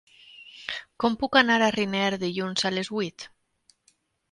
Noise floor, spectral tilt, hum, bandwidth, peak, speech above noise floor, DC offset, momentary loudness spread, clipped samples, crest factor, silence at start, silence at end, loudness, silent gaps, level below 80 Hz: -67 dBFS; -4 dB/octave; none; 11.5 kHz; -6 dBFS; 43 dB; under 0.1%; 18 LU; under 0.1%; 22 dB; 0.4 s; 1.05 s; -25 LUFS; none; -64 dBFS